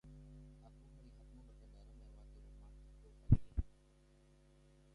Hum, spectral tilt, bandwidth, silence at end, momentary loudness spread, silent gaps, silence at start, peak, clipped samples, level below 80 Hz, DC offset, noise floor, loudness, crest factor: none; -10 dB/octave; 5.4 kHz; 1.3 s; 26 LU; none; 0.35 s; -14 dBFS; under 0.1%; -50 dBFS; under 0.1%; -68 dBFS; -38 LUFS; 28 dB